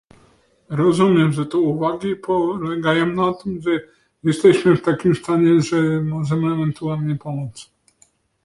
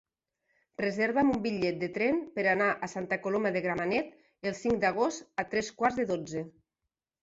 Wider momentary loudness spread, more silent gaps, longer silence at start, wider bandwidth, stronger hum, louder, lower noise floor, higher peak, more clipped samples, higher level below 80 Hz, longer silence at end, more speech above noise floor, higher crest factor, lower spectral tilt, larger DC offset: about the same, 10 LU vs 10 LU; neither; about the same, 0.7 s vs 0.8 s; first, 11.5 kHz vs 8 kHz; neither; first, -19 LUFS vs -30 LUFS; second, -59 dBFS vs -88 dBFS; first, -2 dBFS vs -12 dBFS; neither; first, -54 dBFS vs -62 dBFS; about the same, 0.8 s vs 0.75 s; second, 41 dB vs 58 dB; about the same, 16 dB vs 18 dB; first, -7 dB/octave vs -5.5 dB/octave; neither